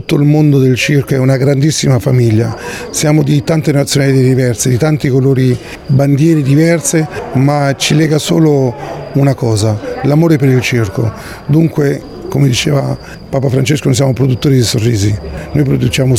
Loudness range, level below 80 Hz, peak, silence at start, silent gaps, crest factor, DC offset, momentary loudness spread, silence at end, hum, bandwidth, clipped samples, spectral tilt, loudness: 2 LU; -36 dBFS; 0 dBFS; 0 s; none; 10 dB; under 0.1%; 8 LU; 0 s; none; 15.5 kHz; under 0.1%; -6 dB/octave; -11 LUFS